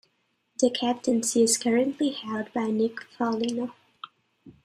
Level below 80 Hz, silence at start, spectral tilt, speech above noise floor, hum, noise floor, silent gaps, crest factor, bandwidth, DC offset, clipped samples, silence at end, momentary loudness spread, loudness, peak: -72 dBFS; 0.6 s; -3 dB/octave; 47 dB; none; -72 dBFS; none; 18 dB; 15 kHz; under 0.1%; under 0.1%; 0.15 s; 20 LU; -26 LUFS; -8 dBFS